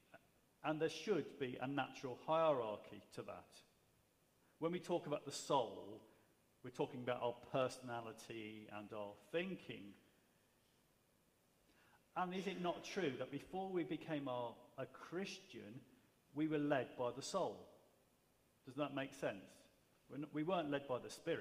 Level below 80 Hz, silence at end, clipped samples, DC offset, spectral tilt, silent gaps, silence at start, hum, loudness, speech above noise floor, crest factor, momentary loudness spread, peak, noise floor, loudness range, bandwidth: -84 dBFS; 0 s; under 0.1%; under 0.1%; -5 dB/octave; none; 0.15 s; none; -45 LUFS; 33 dB; 22 dB; 15 LU; -24 dBFS; -77 dBFS; 7 LU; 15.5 kHz